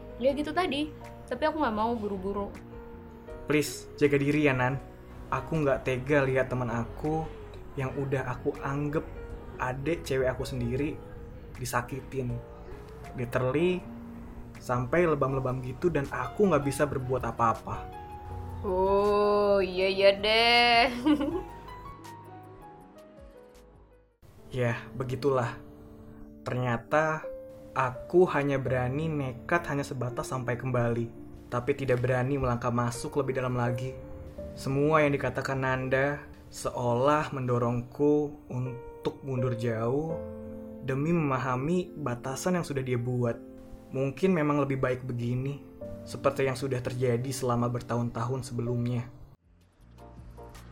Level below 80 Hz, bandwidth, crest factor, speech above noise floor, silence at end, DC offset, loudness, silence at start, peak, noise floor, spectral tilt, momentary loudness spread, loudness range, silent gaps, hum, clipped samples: -50 dBFS; 16.5 kHz; 20 dB; 32 dB; 0 s; under 0.1%; -29 LUFS; 0 s; -10 dBFS; -60 dBFS; -6 dB/octave; 19 LU; 8 LU; none; none; under 0.1%